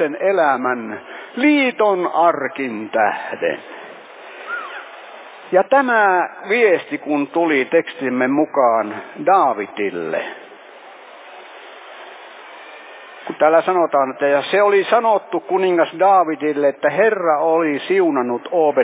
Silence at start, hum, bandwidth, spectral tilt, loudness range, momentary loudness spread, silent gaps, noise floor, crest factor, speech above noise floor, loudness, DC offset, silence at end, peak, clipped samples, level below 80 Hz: 0 s; none; 4 kHz; -8.5 dB/octave; 7 LU; 22 LU; none; -40 dBFS; 16 dB; 24 dB; -17 LUFS; under 0.1%; 0 s; -2 dBFS; under 0.1%; -76 dBFS